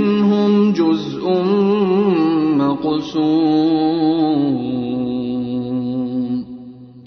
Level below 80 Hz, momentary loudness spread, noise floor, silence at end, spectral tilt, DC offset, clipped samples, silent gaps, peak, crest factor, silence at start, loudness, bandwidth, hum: -54 dBFS; 7 LU; -37 dBFS; 0 s; -8.5 dB/octave; under 0.1%; under 0.1%; none; -6 dBFS; 12 dB; 0 s; -17 LUFS; 6.4 kHz; none